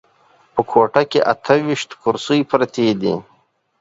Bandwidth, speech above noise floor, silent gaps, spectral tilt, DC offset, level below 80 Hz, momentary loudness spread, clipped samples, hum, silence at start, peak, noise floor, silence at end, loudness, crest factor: 8 kHz; 42 dB; none; -5.5 dB/octave; under 0.1%; -58 dBFS; 7 LU; under 0.1%; none; 0.55 s; 0 dBFS; -59 dBFS; 0.6 s; -18 LUFS; 18 dB